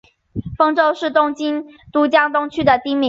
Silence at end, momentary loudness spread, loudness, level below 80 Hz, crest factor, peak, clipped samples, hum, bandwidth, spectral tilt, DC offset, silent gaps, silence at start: 0 s; 13 LU; -17 LUFS; -48 dBFS; 16 dB; -2 dBFS; under 0.1%; none; 7.6 kHz; -6 dB/octave; under 0.1%; none; 0.35 s